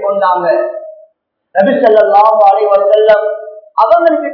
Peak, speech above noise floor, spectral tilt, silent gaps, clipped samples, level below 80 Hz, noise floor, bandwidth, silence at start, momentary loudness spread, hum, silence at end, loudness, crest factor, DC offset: 0 dBFS; 47 dB; -7.5 dB/octave; none; 1%; -58 dBFS; -55 dBFS; 5.4 kHz; 0 s; 13 LU; none; 0 s; -9 LUFS; 10 dB; under 0.1%